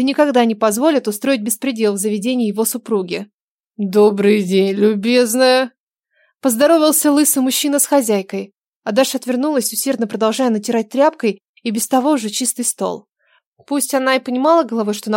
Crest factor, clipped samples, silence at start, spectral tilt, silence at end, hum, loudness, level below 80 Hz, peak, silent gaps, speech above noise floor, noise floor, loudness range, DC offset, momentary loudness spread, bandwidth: 14 dB; under 0.1%; 0 s; -3.5 dB/octave; 0 s; none; -16 LUFS; -76 dBFS; -2 dBFS; 3.34-3.64 s, 5.78-5.91 s, 8.58-8.82 s, 11.45-11.54 s, 13.46-13.56 s; 47 dB; -63 dBFS; 4 LU; under 0.1%; 10 LU; 17 kHz